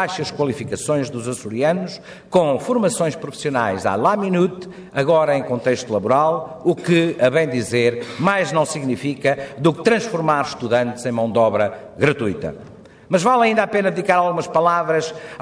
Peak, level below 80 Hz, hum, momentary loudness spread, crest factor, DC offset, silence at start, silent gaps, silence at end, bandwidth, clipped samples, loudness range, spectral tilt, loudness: -2 dBFS; -58 dBFS; none; 7 LU; 16 dB; under 0.1%; 0 s; none; 0 s; 11 kHz; under 0.1%; 2 LU; -5.5 dB/octave; -19 LUFS